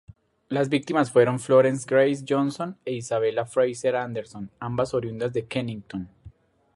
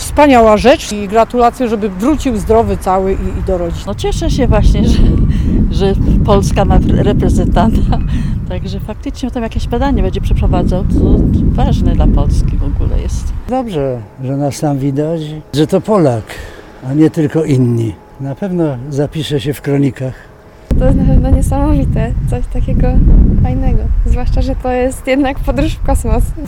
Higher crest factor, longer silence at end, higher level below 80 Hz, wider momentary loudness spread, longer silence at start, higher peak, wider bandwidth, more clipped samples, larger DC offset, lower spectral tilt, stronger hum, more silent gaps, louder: first, 20 dB vs 12 dB; first, 0.45 s vs 0 s; second, -60 dBFS vs -16 dBFS; first, 15 LU vs 9 LU; first, 0.5 s vs 0 s; second, -6 dBFS vs 0 dBFS; second, 11.5 kHz vs 15.5 kHz; second, under 0.1% vs 0.4%; neither; about the same, -6 dB/octave vs -7 dB/octave; neither; neither; second, -24 LUFS vs -13 LUFS